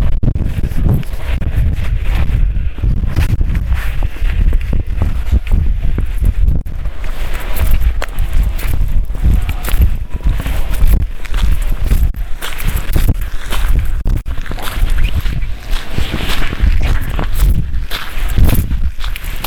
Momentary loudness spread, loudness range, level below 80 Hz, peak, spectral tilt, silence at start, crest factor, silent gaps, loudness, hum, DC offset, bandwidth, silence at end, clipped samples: 6 LU; 2 LU; -14 dBFS; 0 dBFS; -5.5 dB/octave; 0 s; 12 dB; none; -18 LUFS; none; under 0.1%; 19 kHz; 0 s; under 0.1%